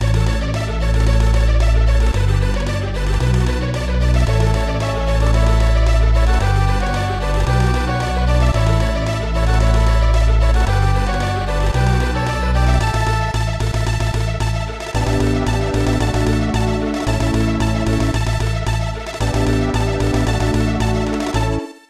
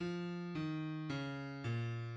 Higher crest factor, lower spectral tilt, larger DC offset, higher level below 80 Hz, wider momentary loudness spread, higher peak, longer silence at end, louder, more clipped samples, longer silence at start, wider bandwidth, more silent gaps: about the same, 14 dB vs 12 dB; second, -6 dB/octave vs -7.5 dB/octave; neither; first, -18 dBFS vs -72 dBFS; about the same, 4 LU vs 2 LU; first, -2 dBFS vs -28 dBFS; first, 0.2 s vs 0 s; first, -18 LUFS vs -42 LUFS; neither; about the same, 0 s vs 0 s; first, 12 kHz vs 8 kHz; neither